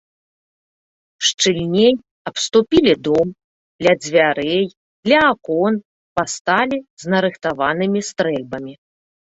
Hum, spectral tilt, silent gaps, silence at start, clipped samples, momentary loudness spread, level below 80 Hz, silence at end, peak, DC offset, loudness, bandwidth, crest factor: none; -4 dB/octave; 1.34-1.38 s, 2.11-2.25 s, 3.44-3.79 s, 4.77-5.03 s, 5.85-6.16 s, 6.41-6.45 s, 6.90-6.97 s; 1.2 s; under 0.1%; 11 LU; -52 dBFS; 0.65 s; -2 dBFS; under 0.1%; -18 LUFS; 8.4 kHz; 18 dB